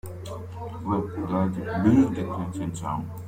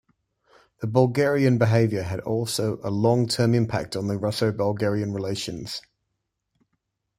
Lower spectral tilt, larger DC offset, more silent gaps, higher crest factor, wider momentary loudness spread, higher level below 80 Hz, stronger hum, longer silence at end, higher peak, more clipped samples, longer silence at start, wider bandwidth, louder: first, -8 dB/octave vs -6 dB/octave; neither; neither; about the same, 18 dB vs 20 dB; first, 16 LU vs 10 LU; first, -52 dBFS vs -58 dBFS; neither; second, 0 s vs 1.4 s; second, -8 dBFS vs -4 dBFS; neither; second, 0.05 s vs 0.8 s; first, 16 kHz vs 14.5 kHz; about the same, -26 LUFS vs -24 LUFS